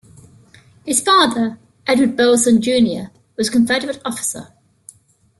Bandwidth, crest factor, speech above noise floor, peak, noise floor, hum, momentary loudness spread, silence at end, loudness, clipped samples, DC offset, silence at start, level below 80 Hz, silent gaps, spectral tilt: 12.5 kHz; 16 dB; 35 dB; -2 dBFS; -50 dBFS; none; 14 LU; 0.95 s; -16 LUFS; under 0.1%; under 0.1%; 0.85 s; -56 dBFS; none; -3 dB/octave